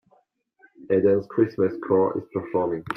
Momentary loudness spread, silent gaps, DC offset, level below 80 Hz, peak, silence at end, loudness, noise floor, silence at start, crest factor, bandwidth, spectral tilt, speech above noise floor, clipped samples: 6 LU; none; under 0.1%; -64 dBFS; -8 dBFS; 0 s; -23 LUFS; -64 dBFS; 0.8 s; 16 dB; 9.4 kHz; -9.5 dB/octave; 42 dB; under 0.1%